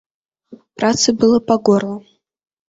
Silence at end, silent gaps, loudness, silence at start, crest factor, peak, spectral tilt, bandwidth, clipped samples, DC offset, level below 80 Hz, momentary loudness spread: 0.7 s; none; -15 LUFS; 0.5 s; 16 dB; -2 dBFS; -4 dB/octave; 8 kHz; under 0.1%; under 0.1%; -54 dBFS; 11 LU